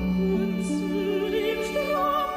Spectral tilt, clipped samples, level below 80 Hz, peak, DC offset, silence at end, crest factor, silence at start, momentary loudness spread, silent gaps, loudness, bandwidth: -6 dB/octave; under 0.1%; -46 dBFS; -14 dBFS; under 0.1%; 0 s; 12 dB; 0 s; 3 LU; none; -26 LUFS; 15.5 kHz